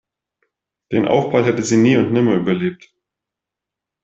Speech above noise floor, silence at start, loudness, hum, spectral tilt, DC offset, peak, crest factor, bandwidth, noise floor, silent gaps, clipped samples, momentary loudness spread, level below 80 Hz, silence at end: 69 dB; 0.9 s; -16 LUFS; none; -6 dB/octave; under 0.1%; -2 dBFS; 16 dB; 8.2 kHz; -85 dBFS; none; under 0.1%; 8 LU; -58 dBFS; 1.3 s